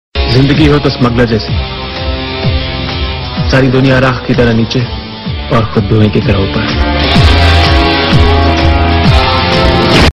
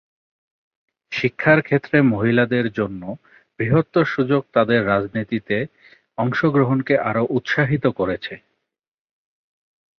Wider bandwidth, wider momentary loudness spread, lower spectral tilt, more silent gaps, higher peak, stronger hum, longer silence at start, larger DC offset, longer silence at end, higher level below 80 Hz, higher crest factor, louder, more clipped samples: first, 11 kHz vs 6.6 kHz; second, 9 LU vs 12 LU; second, -6.5 dB/octave vs -8 dB/octave; neither; about the same, 0 dBFS vs -2 dBFS; neither; second, 0.15 s vs 1.1 s; neither; second, 0 s vs 1.6 s; first, -16 dBFS vs -54 dBFS; second, 8 dB vs 18 dB; first, -9 LUFS vs -19 LUFS; first, 1% vs under 0.1%